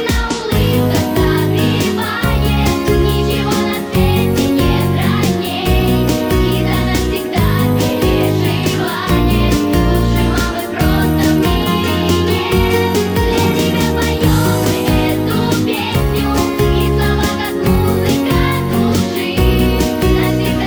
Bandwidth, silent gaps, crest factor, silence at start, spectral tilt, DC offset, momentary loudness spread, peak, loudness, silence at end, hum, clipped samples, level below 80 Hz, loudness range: over 20 kHz; none; 12 dB; 0 s; -6 dB/octave; under 0.1%; 3 LU; 0 dBFS; -14 LUFS; 0 s; none; under 0.1%; -22 dBFS; 1 LU